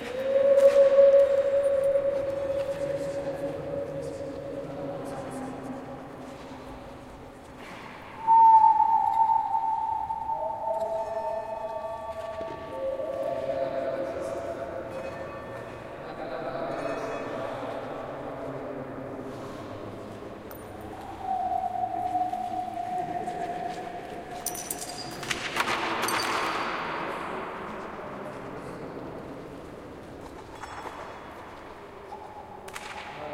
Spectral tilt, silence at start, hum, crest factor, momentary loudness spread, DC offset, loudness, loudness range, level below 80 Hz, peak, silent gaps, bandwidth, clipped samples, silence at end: -4 dB/octave; 0 s; none; 20 dB; 20 LU; under 0.1%; -28 LUFS; 17 LU; -56 dBFS; -8 dBFS; none; 16 kHz; under 0.1%; 0 s